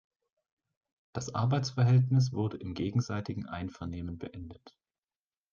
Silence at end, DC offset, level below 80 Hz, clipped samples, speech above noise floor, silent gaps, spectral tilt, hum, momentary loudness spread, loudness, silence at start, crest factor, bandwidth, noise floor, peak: 0.85 s; under 0.1%; -64 dBFS; under 0.1%; over 59 dB; none; -7 dB/octave; none; 17 LU; -31 LUFS; 1.15 s; 18 dB; 7.2 kHz; under -90 dBFS; -16 dBFS